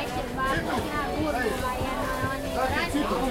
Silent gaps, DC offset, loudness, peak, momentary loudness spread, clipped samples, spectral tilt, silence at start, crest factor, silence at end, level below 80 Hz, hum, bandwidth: none; under 0.1%; -28 LUFS; -14 dBFS; 3 LU; under 0.1%; -5 dB/octave; 0 s; 14 dB; 0 s; -40 dBFS; none; 16 kHz